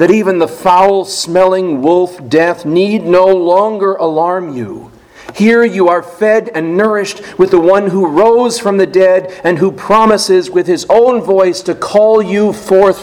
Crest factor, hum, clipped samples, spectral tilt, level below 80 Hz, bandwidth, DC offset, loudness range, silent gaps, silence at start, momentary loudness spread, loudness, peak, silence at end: 10 dB; none; 0.6%; -5.5 dB/octave; -48 dBFS; 15.5 kHz; under 0.1%; 3 LU; none; 0 s; 6 LU; -10 LUFS; 0 dBFS; 0 s